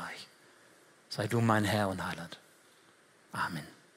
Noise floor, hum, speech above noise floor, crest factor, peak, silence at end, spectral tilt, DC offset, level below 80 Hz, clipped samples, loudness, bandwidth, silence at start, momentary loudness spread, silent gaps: -63 dBFS; none; 31 dB; 24 dB; -12 dBFS; 0.25 s; -5.5 dB/octave; under 0.1%; -72 dBFS; under 0.1%; -33 LUFS; 16 kHz; 0 s; 19 LU; none